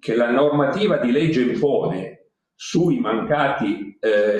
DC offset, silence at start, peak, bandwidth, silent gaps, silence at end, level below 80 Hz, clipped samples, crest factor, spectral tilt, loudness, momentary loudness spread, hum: under 0.1%; 0.05 s; -4 dBFS; 9.8 kHz; none; 0 s; -60 dBFS; under 0.1%; 16 dB; -6.5 dB/octave; -20 LUFS; 8 LU; none